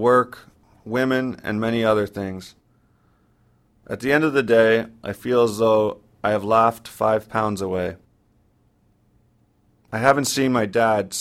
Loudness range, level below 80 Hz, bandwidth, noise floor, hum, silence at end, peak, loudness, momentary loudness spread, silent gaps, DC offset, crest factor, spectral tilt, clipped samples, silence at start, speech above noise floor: 6 LU; -56 dBFS; 15.5 kHz; -61 dBFS; none; 0 s; 0 dBFS; -21 LUFS; 12 LU; none; under 0.1%; 22 dB; -5 dB/octave; under 0.1%; 0 s; 41 dB